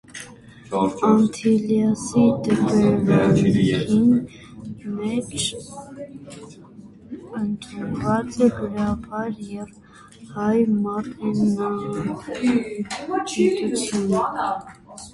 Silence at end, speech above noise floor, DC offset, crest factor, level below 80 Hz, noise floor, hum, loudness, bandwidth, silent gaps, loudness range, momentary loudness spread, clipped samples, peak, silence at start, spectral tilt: 0.05 s; 23 dB; under 0.1%; 18 dB; -50 dBFS; -44 dBFS; none; -21 LUFS; 11.5 kHz; none; 10 LU; 20 LU; under 0.1%; -2 dBFS; 0.1 s; -6 dB/octave